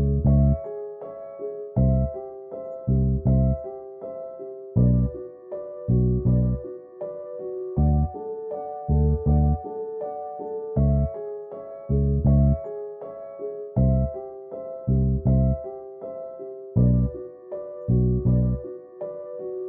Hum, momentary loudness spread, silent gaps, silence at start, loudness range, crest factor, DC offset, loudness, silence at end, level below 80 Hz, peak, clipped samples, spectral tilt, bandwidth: none; 16 LU; none; 0 s; 1 LU; 16 dB; under 0.1%; -24 LUFS; 0 s; -30 dBFS; -8 dBFS; under 0.1%; -16 dB/octave; 2.1 kHz